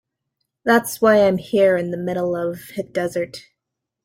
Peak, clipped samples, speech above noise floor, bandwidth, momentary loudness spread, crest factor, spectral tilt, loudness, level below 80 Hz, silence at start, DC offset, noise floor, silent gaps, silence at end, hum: -2 dBFS; under 0.1%; 63 dB; 16 kHz; 12 LU; 18 dB; -5.5 dB/octave; -19 LUFS; -60 dBFS; 0.65 s; under 0.1%; -82 dBFS; none; 0.65 s; none